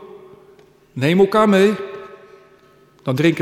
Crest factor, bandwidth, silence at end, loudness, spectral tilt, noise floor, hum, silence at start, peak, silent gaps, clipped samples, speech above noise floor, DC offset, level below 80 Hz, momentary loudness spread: 16 dB; 14 kHz; 0 s; -16 LUFS; -6.5 dB/octave; -51 dBFS; none; 0 s; -4 dBFS; none; under 0.1%; 36 dB; under 0.1%; -60 dBFS; 20 LU